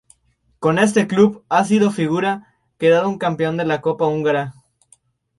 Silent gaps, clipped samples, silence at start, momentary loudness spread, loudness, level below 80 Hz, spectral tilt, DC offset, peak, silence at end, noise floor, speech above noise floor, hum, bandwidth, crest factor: none; under 0.1%; 0.6 s; 7 LU; -18 LUFS; -58 dBFS; -6 dB/octave; under 0.1%; -2 dBFS; 0.9 s; -63 dBFS; 46 dB; none; 11.5 kHz; 18 dB